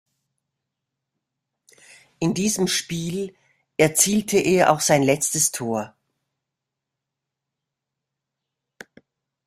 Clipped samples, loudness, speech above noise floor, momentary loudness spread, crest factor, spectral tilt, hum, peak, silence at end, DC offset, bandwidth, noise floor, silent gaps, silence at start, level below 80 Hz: under 0.1%; -20 LUFS; 64 dB; 12 LU; 24 dB; -3.5 dB/octave; none; -2 dBFS; 3.6 s; under 0.1%; 16 kHz; -84 dBFS; none; 2.2 s; -60 dBFS